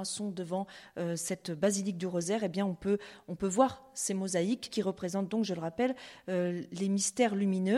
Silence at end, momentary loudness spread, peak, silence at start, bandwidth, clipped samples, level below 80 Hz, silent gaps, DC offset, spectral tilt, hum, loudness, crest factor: 0 s; 8 LU; -12 dBFS; 0 s; 14 kHz; under 0.1%; -68 dBFS; none; under 0.1%; -5 dB/octave; none; -33 LUFS; 20 dB